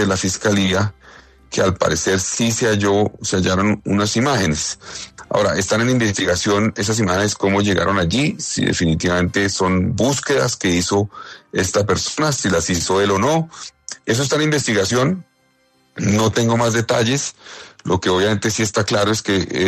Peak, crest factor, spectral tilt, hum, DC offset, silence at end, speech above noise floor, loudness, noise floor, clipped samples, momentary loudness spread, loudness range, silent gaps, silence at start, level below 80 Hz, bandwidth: -4 dBFS; 14 dB; -4 dB/octave; none; under 0.1%; 0 s; 42 dB; -18 LUFS; -59 dBFS; under 0.1%; 7 LU; 2 LU; none; 0 s; -48 dBFS; 14 kHz